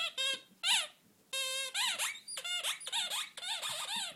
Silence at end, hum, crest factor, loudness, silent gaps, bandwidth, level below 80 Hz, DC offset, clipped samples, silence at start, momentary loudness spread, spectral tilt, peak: 0 s; none; 22 dB; -34 LUFS; none; 16.5 kHz; under -90 dBFS; under 0.1%; under 0.1%; 0 s; 7 LU; 2.5 dB/octave; -16 dBFS